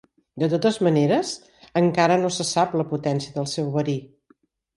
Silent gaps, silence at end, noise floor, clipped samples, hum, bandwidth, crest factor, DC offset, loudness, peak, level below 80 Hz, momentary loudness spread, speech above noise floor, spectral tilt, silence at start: none; 0.7 s; -62 dBFS; under 0.1%; none; 11.5 kHz; 16 dB; under 0.1%; -22 LUFS; -6 dBFS; -62 dBFS; 9 LU; 40 dB; -5.5 dB/octave; 0.35 s